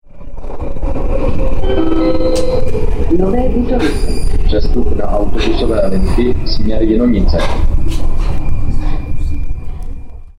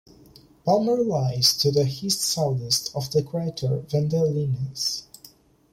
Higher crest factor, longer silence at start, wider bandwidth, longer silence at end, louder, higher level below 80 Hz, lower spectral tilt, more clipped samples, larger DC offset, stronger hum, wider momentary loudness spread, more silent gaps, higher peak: second, 8 dB vs 20 dB; second, 0.05 s vs 0.65 s; second, 10 kHz vs 16.5 kHz; second, 0.1 s vs 0.45 s; first, -16 LUFS vs -23 LUFS; first, -14 dBFS vs -58 dBFS; first, -7 dB/octave vs -5 dB/octave; neither; neither; neither; first, 12 LU vs 8 LU; neither; about the same, -2 dBFS vs -4 dBFS